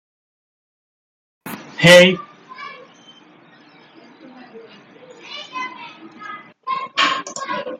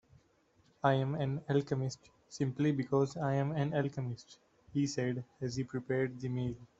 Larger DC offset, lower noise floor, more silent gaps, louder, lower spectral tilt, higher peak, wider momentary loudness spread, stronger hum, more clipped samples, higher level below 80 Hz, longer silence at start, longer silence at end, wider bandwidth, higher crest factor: neither; second, -48 dBFS vs -70 dBFS; neither; first, -15 LUFS vs -35 LUFS; second, -4 dB/octave vs -7 dB/octave; first, 0 dBFS vs -14 dBFS; first, 27 LU vs 8 LU; neither; neither; first, -60 dBFS vs -66 dBFS; first, 1.45 s vs 0.85 s; about the same, 0.05 s vs 0.15 s; first, 15 kHz vs 8 kHz; about the same, 22 dB vs 22 dB